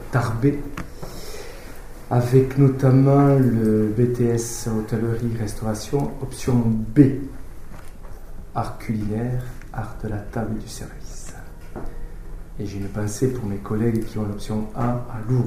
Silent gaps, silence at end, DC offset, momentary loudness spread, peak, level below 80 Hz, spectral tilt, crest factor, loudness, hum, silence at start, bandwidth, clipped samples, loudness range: none; 0 s; under 0.1%; 23 LU; 0 dBFS; -36 dBFS; -7.5 dB/octave; 22 dB; -22 LUFS; none; 0 s; 16 kHz; under 0.1%; 12 LU